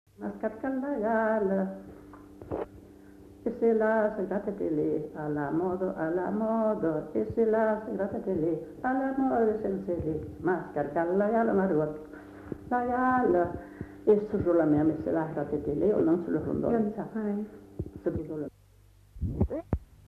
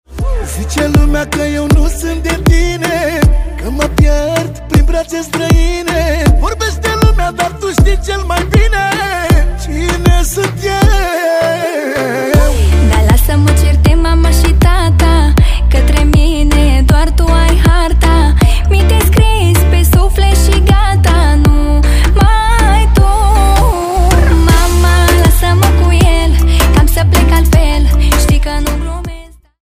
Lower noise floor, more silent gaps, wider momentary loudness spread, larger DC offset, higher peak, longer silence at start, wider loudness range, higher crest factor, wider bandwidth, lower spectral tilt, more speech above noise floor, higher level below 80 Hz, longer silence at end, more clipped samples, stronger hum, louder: first, -58 dBFS vs -30 dBFS; neither; first, 13 LU vs 6 LU; neither; second, -12 dBFS vs 0 dBFS; about the same, 0.2 s vs 0.1 s; about the same, 4 LU vs 3 LU; first, 18 dB vs 8 dB; second, 6.4 kHz vs 16 kHz; first, -10 dB/octave vs -5.5 dB/octave; first, 30 dB vs 19 dB; second, -50 dBFS vs -10 dBFS; about the same, 0.25 s vs 0.35 s; neither; neither; second, -29 LUFS vs -11 LUFS